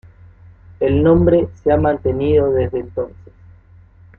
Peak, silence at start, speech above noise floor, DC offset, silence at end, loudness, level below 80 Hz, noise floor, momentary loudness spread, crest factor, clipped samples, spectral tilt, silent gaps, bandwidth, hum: -2 dBFS; 0.8 s; 30 dB; under 0.1%; 1.1 s; -16 LUFS; -38 dBFS; -45 dBFS; 12 LU; 16 dB; under 0.1%; -11 dB/octave; none; 4.2 kHz; none